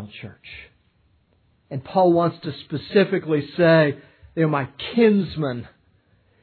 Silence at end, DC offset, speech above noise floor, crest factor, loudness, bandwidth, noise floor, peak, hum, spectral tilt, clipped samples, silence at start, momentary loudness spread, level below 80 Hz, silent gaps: 0.8 s; under 0.1%; 42 dB; 18 dB; -20 LUFS; 4.6 kHz; -62 dBFS; -4 dBFS; none; -10.5 dB/octave; under 0.1%; 0 s; 21 LU; -58 dBFS; none